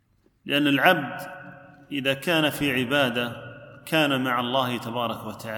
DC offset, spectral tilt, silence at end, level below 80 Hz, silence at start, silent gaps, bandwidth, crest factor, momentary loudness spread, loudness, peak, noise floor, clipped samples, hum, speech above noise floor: under 0.1%; -4.5 dB/octave; 0 s; -62 dBFS; 0.45 s; none; 19 kHz; 24 dB; 19 LU; -24 LUFS; -2 dBFS; -46 dBFS; under 0.1%; none; 22 dB